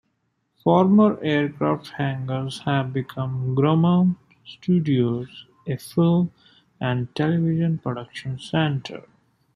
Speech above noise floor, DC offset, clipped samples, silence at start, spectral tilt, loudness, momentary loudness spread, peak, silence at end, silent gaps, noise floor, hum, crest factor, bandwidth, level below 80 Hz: 51 dB; under 0.1%; under 0.1%; 0.65 s; -8 dB/octave; -22 LUFS; 14 LU; -4 dBFS; 0.55 s; none; -72 dBFS; none; 18 dB; 13.5 kHz; -60 dBFS